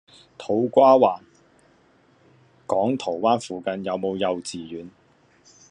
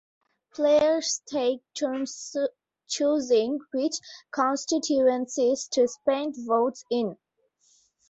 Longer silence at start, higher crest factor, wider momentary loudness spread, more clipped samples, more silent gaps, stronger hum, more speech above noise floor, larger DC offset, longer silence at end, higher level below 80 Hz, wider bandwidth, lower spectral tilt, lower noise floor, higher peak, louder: second, 0.4 s vs 0.55 s; about the same, 20 dB vs 16 dB; first, 21 LU vs 9 LU; neither; neither; neither; second, 37 dB vs 42 dB; neither; second, 0.8 s vs 0.95 s; about the same, -70 dBFS vs -70 dBFS; first, 10 kHz vs 8.2 kHz; first, -5.5 dB/octave vs -3 dB/octave; second, -58 dBFS vs -67 dBFS; first, -4 dBFS vs -10 dBFS; first, -22 LUFS vs -26 LUFS